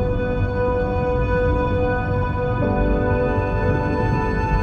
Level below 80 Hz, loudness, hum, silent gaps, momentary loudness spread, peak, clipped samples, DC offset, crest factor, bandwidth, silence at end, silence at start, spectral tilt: -26 dBFS; -21 LUFS; none; none; 2 LU; -8 dBFS; under 0.1%; under 0.1%; 12 dB; 6.6 kHz; 0 s; 0 s; -9 dB/octave